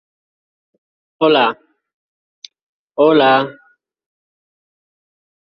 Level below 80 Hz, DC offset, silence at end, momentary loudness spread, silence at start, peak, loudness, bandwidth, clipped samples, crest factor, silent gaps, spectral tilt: -66 dBFS; under 0.1%; 2 s; 17 LU; 1.2 s; 0 dBFS; -14 LUFS; 6.6 kHz; under 0.1%; 18 dB; 1.94-2.42 s, 2.62-2.88 s; -6 dB/octave